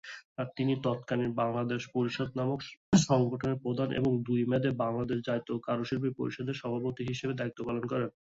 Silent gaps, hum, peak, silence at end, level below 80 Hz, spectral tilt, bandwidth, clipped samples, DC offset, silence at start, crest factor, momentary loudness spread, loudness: 0.25-0.36 s, 2.77-2.92 s; none; -10 dBFS; 0.2 s; -62 dBFS; -6 dB/octave; 8 kHz; under 0.1%; under 0.1%; 0.05 s; 20 dB; 7 LU; -32 LUFS